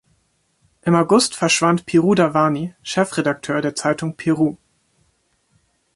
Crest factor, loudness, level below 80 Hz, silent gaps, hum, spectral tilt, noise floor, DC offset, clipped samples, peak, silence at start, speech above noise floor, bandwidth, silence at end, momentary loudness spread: 18 dB; -18 LUFS; -58 dBFS; none; none; -5 dB/octave; -65 dBFS; under 0.1%; under 0.1%; -2 dBFS; 0.85 s; 47 dB; 11.5 kHz; 1.4 s; 7 LU